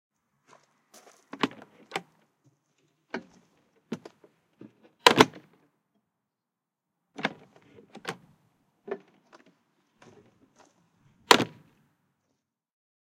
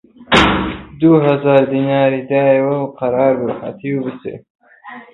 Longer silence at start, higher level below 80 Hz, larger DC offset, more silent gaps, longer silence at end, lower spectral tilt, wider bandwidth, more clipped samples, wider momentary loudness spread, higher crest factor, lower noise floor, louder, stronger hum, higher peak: first, 1.4 s vs 0.2 s; second, -74 dBFS vs -38 dBFS; neither; second, none vs 4.50-4.59 s; first, 1.7 s vs 0.1 s; second, -3 dB/octave vs -6.5 dB/octave; first, 16 kHz vs 10 kHz; neither; first, 20 LU vs 13 LU; first, 34 dB vs 16 dB; first, -87 dBFS vs -36 dBFS; second, -25 LUFS vs -15 LUFS; neither; about the same, 0 dBFS vs 0 dBFS